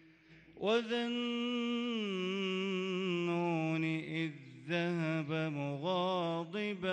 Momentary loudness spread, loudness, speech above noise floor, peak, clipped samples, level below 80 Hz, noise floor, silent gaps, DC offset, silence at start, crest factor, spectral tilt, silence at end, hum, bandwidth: 5 LU; -36 LUFS; 26 dB; -22 dBFS; under 0.1%; -80 dBFS; -61 dBFS; none; under 0.1%; 0.3 s; 14 dB; -6.5 dB/octave; 0 s; none; 9.2 kHz